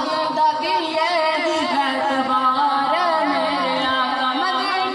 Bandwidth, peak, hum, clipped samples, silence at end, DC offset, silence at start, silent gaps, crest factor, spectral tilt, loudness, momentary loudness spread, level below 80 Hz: 12 kHz; -8 dBFS; none; under 0.1%; 0 s; under 0.1%; 0 s; none; 12 dB; -3 dB/octave; -19 LUFS; 2 LU; -64 dBFS